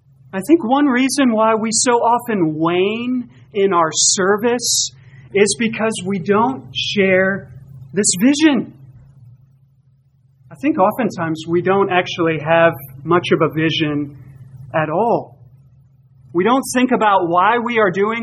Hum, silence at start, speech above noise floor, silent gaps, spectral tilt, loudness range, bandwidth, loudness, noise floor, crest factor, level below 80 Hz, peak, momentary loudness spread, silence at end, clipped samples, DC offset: none; 0.35 s; 39 dB; none; -3.5 dB/octave; 4 LU; 15 kHz; -16 LUFS; -54 dBFS; 16 dB; -56 dBFS; 0 dBFS; 9 LU; 0 s; under 0.1%; under 0.1%